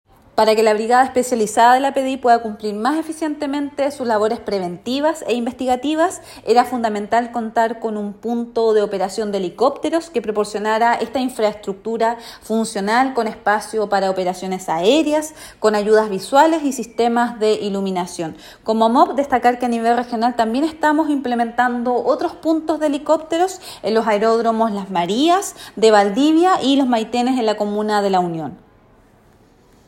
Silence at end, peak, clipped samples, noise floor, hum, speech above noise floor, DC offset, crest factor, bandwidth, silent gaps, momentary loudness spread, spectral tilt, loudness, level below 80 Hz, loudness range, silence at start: 1.3 s; 0 dBFS; under 0.1%; -51 dBFS; none; 34 dB; under 0.1%; 18 dB; 16.5 kHz; none; 9 LU; -4.5 dB/octave; -18 LUFS; -56 dBFS; 4 LU; 0.35 s